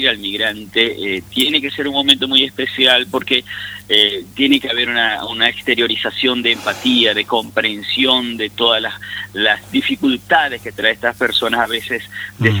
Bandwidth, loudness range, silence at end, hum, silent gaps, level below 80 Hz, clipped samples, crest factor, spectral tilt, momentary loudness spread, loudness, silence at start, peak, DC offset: over 20 kHz; 3 LU; 0 s; 50 Hz at -45 dBFS; none; -52 dBFS; under 0.1%; 16 dB; -4 dB/octave; 8 LU; -15 LUFS; 0 s; 0 dBFS; under 0.1%